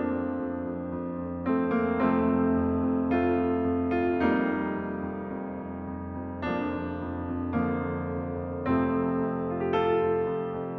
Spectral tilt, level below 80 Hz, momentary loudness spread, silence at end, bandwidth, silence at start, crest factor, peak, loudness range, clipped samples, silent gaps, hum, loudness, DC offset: -10 dB/octave; -50 dBFS; 9 LU; 0 s; 4.8 kHz; 0 s; 14 dB; -14 dBFS; 6 LU; under 0.1%; none; none; -29 LUFS; under 0.1%